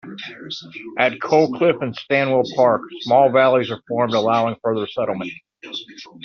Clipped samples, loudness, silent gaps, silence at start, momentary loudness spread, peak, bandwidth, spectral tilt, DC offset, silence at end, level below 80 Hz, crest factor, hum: under 0.1%; -18 LUFS; none; 0.05 s; 16 LU; -2 dBFS; 6.8 kHz; -3.5 dB/octave; under 0.1%; 0 s; -64 dBFS; 16 dB; none